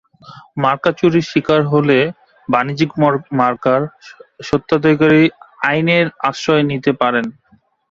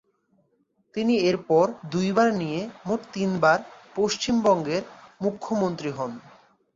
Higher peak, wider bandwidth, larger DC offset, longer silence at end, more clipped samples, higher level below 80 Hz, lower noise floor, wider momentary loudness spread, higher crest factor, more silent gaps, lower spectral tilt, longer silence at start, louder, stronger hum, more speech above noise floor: first, 0 dBFS vs -6 dBFS; about the same, 7.6 kHz vs 7.6 kHz; neither; about the same, 0.6 s vs 0.5 s; neither; first, -52 dBFS vs -62 dBFS; second, -55 dBFS vs -69 dBFS; second, 8 LU vs 11 LU; about the same, 16 dB vs 20 dB; neither; about the same, -6.5 dB/octave vs -5.5 dB/octave; second, 0.3 s vs 0.95 s; first, -15 LUFS vs -25 LUFS; neither; second, 40 dB vs 45 dB